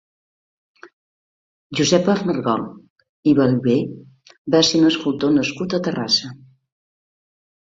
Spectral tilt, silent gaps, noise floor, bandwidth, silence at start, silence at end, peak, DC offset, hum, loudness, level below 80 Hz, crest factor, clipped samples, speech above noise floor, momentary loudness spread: -5 dB/octave; 0.93-1.70 s, 2.90-2.96 s, 3.09-3.23 s, 4.38-4.45 s; under -90 dBFS; 7.8 kHz; 0.85 s; 1.3 s; -2 dBFS; under 0.1%; none; -18 LUFS; -58 dBFS; 18 dB; under 0.1%; over 72 dB; 11 LU